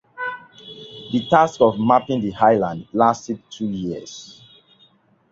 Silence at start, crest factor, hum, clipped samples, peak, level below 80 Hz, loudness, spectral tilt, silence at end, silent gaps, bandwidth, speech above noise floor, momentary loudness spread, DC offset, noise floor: 0.2 s; 20 dB; none; under 0.1%; -2 dBFS; -56 dBFS; -19 LUFS; -6 dB/octave; 1 s; none; 7.8 kHz; 38 dB; 20 LU; under 0.1%; -57 dBFS